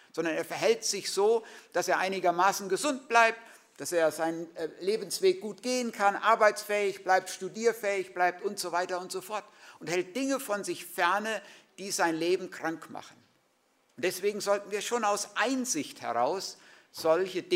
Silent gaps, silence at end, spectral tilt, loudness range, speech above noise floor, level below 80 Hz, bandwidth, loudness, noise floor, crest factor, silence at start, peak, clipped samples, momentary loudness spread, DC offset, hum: none; 0 s; -2.5 dB/octave; 5 LU; 41 dB; -86 dBFS; 16 kHz; -29 LUFS; -70 dBFS; 22 dB; 0.15 s; -8 dBFS; under 0.1%; 10 LU; under 0.1%; none